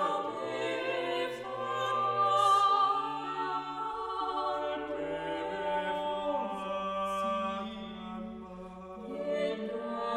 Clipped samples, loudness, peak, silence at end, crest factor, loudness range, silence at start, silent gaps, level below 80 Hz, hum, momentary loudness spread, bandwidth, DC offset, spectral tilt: under 0.1%; -32 LUFS; -16 dBFS; 0 s; 16 dB; 7 LU; 0 s; none; -64 dBFS; none; 15 LU; 13 kHz; under 0.1%; -4.5 dB/octave